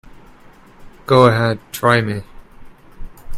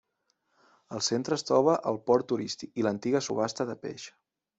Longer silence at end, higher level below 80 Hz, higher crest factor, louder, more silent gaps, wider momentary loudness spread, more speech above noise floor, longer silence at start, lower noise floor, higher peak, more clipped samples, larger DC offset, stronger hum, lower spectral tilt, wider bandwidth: second, 0 s vs 0.5 s; first, -40 dBFS vs -70 dBFS; about the same, 18 dB vs 20 dB; first, -15 LUFS vs -29 LUFS; neither; about the same, 15 LU vs 15 LU; second, 29 dB vs 48 dB; about the same, 0.8 s vs 0.9 s; second, -44 dBFS vs -77 dBFS; first, 0 dBFS vs -10 dBFS; neither; neither; neither; first, -6 dB/octave vs -4.5 dB/octave; first, 15.5 kHz vs 8.2 kHz